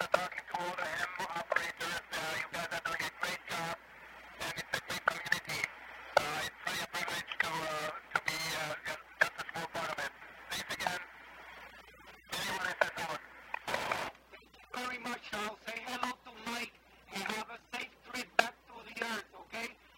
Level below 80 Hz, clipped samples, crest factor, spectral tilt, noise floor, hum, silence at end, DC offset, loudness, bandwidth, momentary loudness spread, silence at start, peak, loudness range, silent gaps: -68 dBFS; under 0.1%; 28 dB; -2 dB/octave; -58 dBFS; none; 0 s; under 0.1%; -37 LUFS; 16 kHz; 14 LU; 0 s; -12 dBFS; 5 LU; none